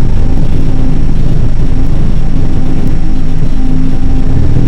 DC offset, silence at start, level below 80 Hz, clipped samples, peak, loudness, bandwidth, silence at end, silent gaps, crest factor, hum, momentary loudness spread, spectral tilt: 7%; 0 s; -8 dBFS; 6%; 0 dBFS; -14 LUFS; 3.5 kHz; 0 s; none; 4 dB; none; 2 LU; -8.5 dB/octave